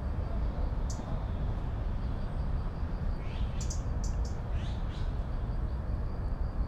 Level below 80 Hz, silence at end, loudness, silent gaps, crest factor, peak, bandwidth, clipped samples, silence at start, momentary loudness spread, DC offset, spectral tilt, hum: -34 dBFS; 0 s; -36 LUFS; none; 12 dB; -22 dBFS; 8.4 kHz; under 0.1%; 0 s; 2 LU; under 0.1%; -6.5 dB/octave; none